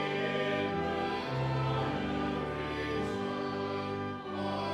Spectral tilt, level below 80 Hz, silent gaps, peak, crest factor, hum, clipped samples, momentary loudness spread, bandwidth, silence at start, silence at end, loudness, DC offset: -6.5 dB/octave; -54 dBFS; none; -20 dBFS; 12 dB; none; under 0.1%; 4 LU; 11.5 kHz; 0 s; 0 s; -34 LUFS; under 0.1%